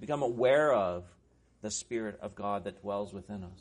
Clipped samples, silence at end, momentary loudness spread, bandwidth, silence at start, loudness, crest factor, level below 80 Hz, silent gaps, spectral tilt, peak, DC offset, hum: under 0.1%; 0.05 s; 17 LU; 10.5 kHz; 0 s; -32 LUFS; 18 dB; -64 dBFS; none; -4.5 dB/octave; -16 dBFS; under 0.1%; none